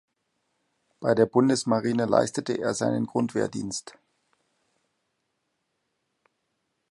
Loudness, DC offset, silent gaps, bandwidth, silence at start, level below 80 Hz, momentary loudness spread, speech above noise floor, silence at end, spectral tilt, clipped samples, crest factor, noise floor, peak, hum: -25 LUFS; under 0.1%; none; 11.5 kHz; 1 s; -66 dBFS; 10 LU; 53 dB; 3 s; -5.5 dB/octave; under 0.1%; 22 dB; -78 dBFS; -6 dBFS; none